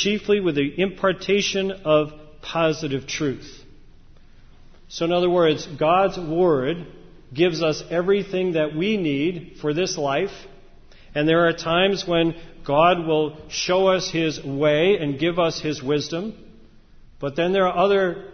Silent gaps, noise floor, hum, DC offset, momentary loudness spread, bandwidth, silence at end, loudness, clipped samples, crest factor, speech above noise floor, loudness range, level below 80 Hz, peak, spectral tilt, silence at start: none; -47 dBFS; none; under 0.1%; 10 LU; 6.6 kHz; 0 s; -21 LUFS; under 0.1%; 18 dB; 26 dB; 4 LU; -48 dBFS; -4 dBFS; -5 dB/octave; 0 s